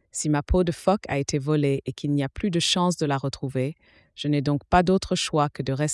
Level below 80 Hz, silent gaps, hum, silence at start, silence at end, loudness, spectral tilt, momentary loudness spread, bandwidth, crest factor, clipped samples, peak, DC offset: -40 dBFS; none; none; 0.15 s; 0 s; -24 LUFS; -5 dB/octave; 7 LU; 12 kHz; 18 dB; under 0.1%; -6 dBFS; under 0.1%